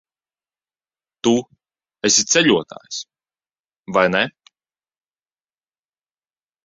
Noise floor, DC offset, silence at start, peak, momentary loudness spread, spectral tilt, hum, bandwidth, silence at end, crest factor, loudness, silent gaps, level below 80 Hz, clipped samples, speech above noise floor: under -90 dBFS; under 0.1%; 1.25 s; -2 dBFS; 16 LU; -2.5 dB/octave; none; 7.8 kHz; 2.35 s; 22 dB; -17 LUFS; 3.79-3.83 s; -62 dBFS; under 0.1%; over 72 dB